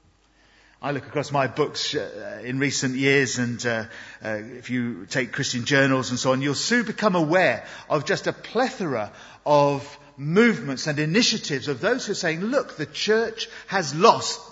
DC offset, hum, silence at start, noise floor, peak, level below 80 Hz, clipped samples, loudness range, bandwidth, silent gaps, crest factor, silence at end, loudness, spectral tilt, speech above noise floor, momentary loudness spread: under 0.1%; none; 0.8 s; -59 dBFS; -2 dBFS; -64 dBFS; under 0.1%; 3 LU; 8 kHz; none; 22 dB; 0 s; -23 LUFS; -4 dB/octave; 36 dB; 12 LU